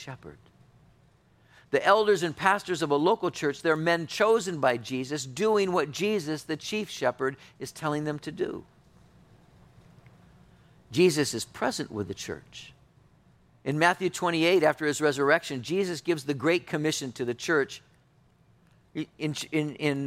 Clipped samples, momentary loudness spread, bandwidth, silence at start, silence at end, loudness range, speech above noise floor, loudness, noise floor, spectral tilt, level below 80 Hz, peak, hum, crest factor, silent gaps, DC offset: under 0.1%; 12 LU; 16 kHz; 0 s; 0 s; 7 LU; 35 dB; -27 LUFS; -62 dBFS; -4.5 dB/octave; -66 dBFS; -6 dBFS; none; 22 dB; none; under 0.1%